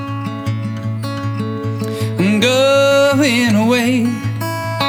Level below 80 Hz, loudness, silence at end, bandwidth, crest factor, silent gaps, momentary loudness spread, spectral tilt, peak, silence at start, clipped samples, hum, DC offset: -54 dBFS; -15 LUFS; 0 s; over 20 kHz; 12 dB; none; 11 LU; -5.5 dB/octave; -2 dBFS; 0 s; under 0.1%; none; under 0.1%